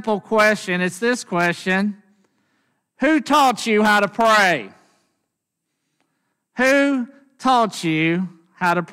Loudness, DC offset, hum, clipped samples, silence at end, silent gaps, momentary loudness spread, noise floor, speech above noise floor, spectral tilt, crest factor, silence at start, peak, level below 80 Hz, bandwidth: -18 LUFS; under 0.1%; none; under 0.1%; 0 s; none; 10 LU; -78 dBFS; 60 dB; -4.5 dB/octave; 16 dB; 0 s; -4 dBFS; -62 dBFS; 16 kHz